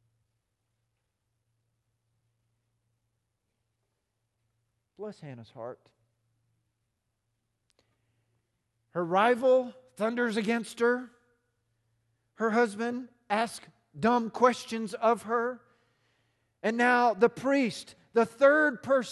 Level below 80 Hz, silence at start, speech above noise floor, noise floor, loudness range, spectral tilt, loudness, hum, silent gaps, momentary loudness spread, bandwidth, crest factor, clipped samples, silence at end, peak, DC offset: -76 dBFS; 5 s; 54 dB; -81 dBFS; 21 LU; -5 dB/octave; -27 LUFS; none; none; 20 LU; 12.5 kHz; 22 dB; under 0.1%; 0 s; -8 dBFS; under 0.1%